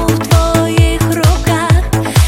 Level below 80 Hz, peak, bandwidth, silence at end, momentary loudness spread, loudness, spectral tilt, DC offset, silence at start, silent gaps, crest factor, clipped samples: -18 dBFS; 0 dBFS; 17 kHz; 0 s; 2 LU; -12 LUFS; -5.5 dB/octave; under 0.1%; 0 s; none; 10 dB; under 0.1%